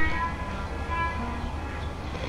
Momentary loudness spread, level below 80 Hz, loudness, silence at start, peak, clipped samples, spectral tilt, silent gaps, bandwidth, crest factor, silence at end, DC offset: 6 LU; -36 dBFS; -31 LUFS; 0 s; -12 dBFS; under 0.1%; -6 dB/octave; none; 11.5 kHz; 16 dB; 0 s; under 0.1%